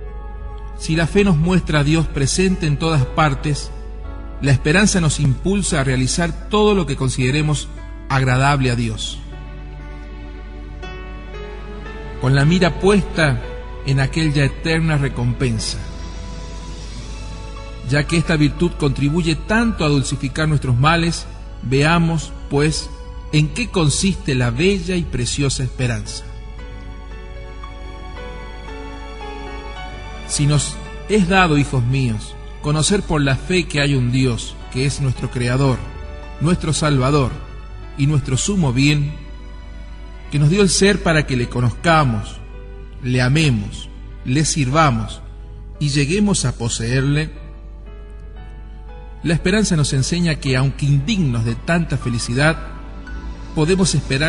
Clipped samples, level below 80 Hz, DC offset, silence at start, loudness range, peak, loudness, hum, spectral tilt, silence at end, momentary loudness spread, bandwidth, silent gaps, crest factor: under 0.1%; -30 dBFS; 0.3%; 0 s; 6 LU; -2 dBFS; -18 LUFS; none; -5 dB/octave; 0 s; 19 LU; 11 kHz; none; 16 dB